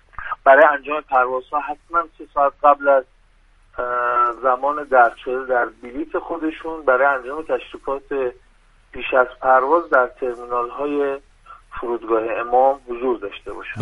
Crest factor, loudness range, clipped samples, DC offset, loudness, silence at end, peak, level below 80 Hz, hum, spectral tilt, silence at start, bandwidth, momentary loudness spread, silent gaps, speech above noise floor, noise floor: 20 dB; 4 LU; under 0.1%; under 0.1%; -19 LUFS; 0 s; 0 dBFS; -50 dBFS; none; -6.5 dB/octave; 0.2 s; 9.2 kHz; 12 LU; none; 35 dB; -54 dBFS